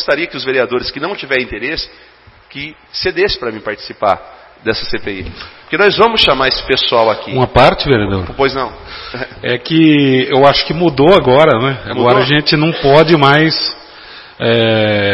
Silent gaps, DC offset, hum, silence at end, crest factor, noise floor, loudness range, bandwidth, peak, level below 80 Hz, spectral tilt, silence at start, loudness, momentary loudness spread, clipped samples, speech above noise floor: none; under 0.1%; none; 0 s; 12 dB; -35 dBFS; 9 LU; 11 kHz; 0 dBFS; -36 dBFS; -7 dB/octave; 0 s; -12 LUFS; 15 LU; 0.2%; 23 dB